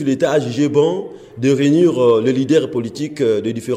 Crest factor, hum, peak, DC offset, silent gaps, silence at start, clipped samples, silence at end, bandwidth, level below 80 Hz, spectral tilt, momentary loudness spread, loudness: 12 dB; none; -4 dBFS; under 0.1%; none; 0 s; under 0.1%; 0 s; 12.5 kHz; -58 dBFS; -6.5 dB/octave; 10 LU; -16 LUFS